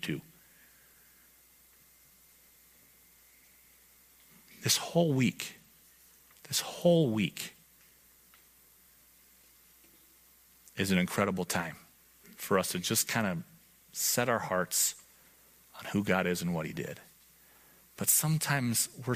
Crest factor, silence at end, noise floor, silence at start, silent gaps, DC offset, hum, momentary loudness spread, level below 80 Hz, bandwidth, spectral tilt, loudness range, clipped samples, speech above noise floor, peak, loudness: 24 dB; 0 s; -62 dBFS; 0 s; none; under 0.1%; none; 16 LU; -70 dBFS; 15.5 kHz; -3.5 dB/octave; 6 LU; under 0.1%; 31 dB; -10 dBFS; -30 LUFS